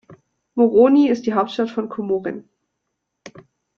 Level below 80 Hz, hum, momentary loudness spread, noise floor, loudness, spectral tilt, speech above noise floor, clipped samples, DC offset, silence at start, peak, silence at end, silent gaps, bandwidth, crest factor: -64 dBFS; none; 16 LU; -77 dBFS; -18 LUFS; -7 dB/octave; 60 dB; under 0.1%; under 0.1%; 0.1 s; -2 dBFS; 0.5 s; none; 7 kHz; 18 dB